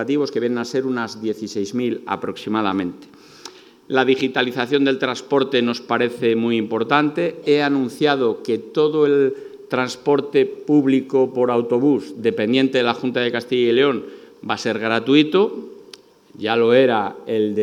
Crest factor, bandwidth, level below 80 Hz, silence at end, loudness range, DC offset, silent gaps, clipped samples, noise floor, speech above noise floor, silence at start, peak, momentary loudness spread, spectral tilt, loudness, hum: 18 dB; 12.5 kHz; -74 dBFS; 0 s; 4 LU; under 0.1%; none; under 0.1%; -45 dBFS; 27 dB; 0 s; 0 dBFS; 9 LU; -5.5 dB/octave; -19 LUFS; none